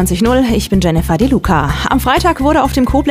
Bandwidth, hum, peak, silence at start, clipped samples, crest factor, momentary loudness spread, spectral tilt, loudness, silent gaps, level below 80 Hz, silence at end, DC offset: 16 kHz; none; 0 dBFS; 0 s; under 0.1%; 12 dB; 2 LU; -5.5 dB/octave; -12 LUFS; none; -22 dBFS; 0 s; under 0.1%